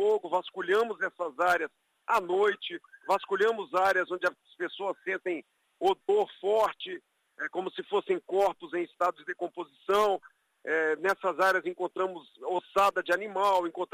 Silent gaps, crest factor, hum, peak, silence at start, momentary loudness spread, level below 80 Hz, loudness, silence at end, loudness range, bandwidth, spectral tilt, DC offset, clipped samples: none; 16 dB; none; -12 dBFS; 0 s; 11 LU; -72 dBFS; -29 LUFS; 0.1 s; 3 LU; 15.5 kHz; -4 dB/octave; under 0.1%; under 0.1%